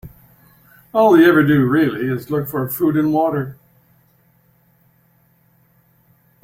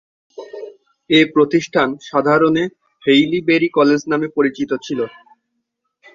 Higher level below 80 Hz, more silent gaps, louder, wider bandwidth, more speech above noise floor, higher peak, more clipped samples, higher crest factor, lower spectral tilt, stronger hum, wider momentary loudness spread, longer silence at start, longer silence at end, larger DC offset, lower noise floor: first, -54 dBFS vs -60 dBFS; neither; about the same, -16 LUFS vs -16 LUFS; first, 16.5 kHz vs 7.6 kHz; second, 42 dB vs 58 dB; about the same, -2 dBFS vs -2 dBFS; neither; about the same, 18 dB vs 16 dB; first, -7.5 dB/octave vs -5.5 dB/octave; neither; second, 12 LU vs 15 LU; second, 0.05 s vs 0.4 s; first, 2.9 s vs 1.05 s; neither; second, -57 dBFS vs -73 dBFS